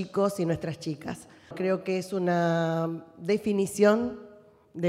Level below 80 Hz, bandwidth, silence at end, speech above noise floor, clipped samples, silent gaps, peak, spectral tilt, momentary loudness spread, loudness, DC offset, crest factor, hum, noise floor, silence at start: -66 dBFS; 15 kHz; 0 s; 26 dB; under 0.1%; none; -10 dBFS; -6.5 dB/octave; 16 LU; -28 LUFS; under 0.1%; 18 dB; none; -53 dBFS; 0 s